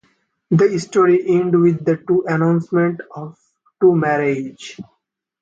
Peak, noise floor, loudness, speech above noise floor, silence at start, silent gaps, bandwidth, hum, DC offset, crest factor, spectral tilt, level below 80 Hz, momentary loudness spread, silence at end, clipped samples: -4 dBFS; -63 dBFS; -16 LUFS; 46 dB; 0.5 s; none; 8 kHz; none; under 0.1%; 14 dB; -7.5 dB/octave; -62 dBFS; 18 LU; 0.6 s; under 0.1%